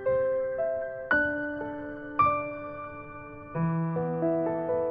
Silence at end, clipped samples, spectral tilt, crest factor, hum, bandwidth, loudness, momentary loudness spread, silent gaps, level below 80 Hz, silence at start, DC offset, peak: 0 s; under 0.1%; -10.5 dB/octave; 18 dB; none; 5 kHz; -29 LUFS; 14 LU; none; -56 dBFS; 0 s; under 0.1%; -12 dBFS